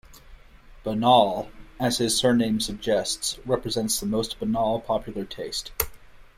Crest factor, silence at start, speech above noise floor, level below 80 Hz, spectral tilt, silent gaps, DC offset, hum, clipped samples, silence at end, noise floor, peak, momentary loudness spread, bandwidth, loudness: 24 dB; 0.1 s; 24 dB; -46 dBFS; -4 dB/octave; none; under 0.1%; none; under 0.1%; 0.15 s; -48 dBFS; -2 dBFS; 12 LU; 16 kHz; -24 LUFS